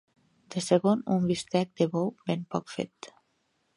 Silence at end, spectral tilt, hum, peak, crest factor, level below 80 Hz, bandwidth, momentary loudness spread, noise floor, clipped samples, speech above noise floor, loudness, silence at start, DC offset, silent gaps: 0.7 s; -6 dB/octave; none; -10 dBFS; 20 dB; -68 dBFS; 11.5 kHz; 13 LU; -74 dBFS; under 0.1%; 46 dB; -29 LUFS; 0.5 s; under 0.1%; none